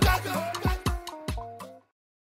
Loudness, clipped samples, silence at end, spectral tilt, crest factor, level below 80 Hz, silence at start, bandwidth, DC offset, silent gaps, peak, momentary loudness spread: -30 LUFS; under 0.1%; 0.45 s; -5 dB/octave; 20 dB; -34 dBFS; 0 s; 16 kHz; under 0.1%; none; -8 dBFS; 16 LU